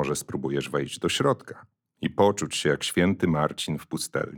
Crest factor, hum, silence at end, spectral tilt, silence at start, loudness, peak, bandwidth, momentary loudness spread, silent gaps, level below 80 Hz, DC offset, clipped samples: 18 dB; none; 0 s; -4.5 dB/octave; 0 s; -26 LUFS; -8 dBFS; over 20 kHz; 8 LU; none; -58 dBFS; under 0.1%; under 0.1%